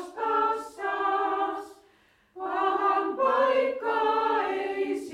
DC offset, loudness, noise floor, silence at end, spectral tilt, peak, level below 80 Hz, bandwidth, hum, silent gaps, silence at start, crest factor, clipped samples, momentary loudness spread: under 0.1%; -26 LUFS; -62 dBFS; 0 s; -3.5 dB/octave; -12 dBFS; -70 dBFS; 13.5 kHz; none; none; 0 s; 14 dB; under 0.1%; 8 LU